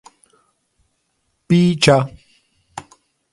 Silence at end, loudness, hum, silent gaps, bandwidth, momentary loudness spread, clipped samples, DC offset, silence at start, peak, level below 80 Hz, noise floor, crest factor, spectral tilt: 0.5 s; -15 LUFS; none; none; 11.5 kHz; 24 LU; under 0.1%; under 0.1%; 1.5 s; 0 dBFS; -52 dBFS; -69 dBFS; 20 dB; -5.5 dB/octave